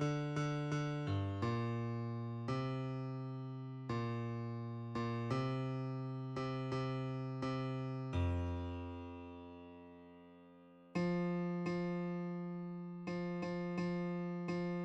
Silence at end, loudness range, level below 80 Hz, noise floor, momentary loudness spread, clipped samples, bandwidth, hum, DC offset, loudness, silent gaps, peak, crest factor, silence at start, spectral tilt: 0 s; 3 LU; -62 dBFS; -61 dBFS; 12 LU; under 0.1%; 8.4 kHz; none; under 0.1%; -41 LUFS; none; -26 dBFS; 14 dB; 0 s; -8 dB/octave